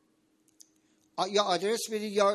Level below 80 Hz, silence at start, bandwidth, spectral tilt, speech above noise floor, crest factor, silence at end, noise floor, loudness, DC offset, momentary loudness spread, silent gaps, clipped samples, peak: -82 dBFS; 1.15 s; 13.5 kHz; -3 dB/octave; 42 dB; 20 dB; 0 s; -69 dBFS; -29 LUFS; under 0.1%; 7 LU; none; under 0.1%; -12 dBFS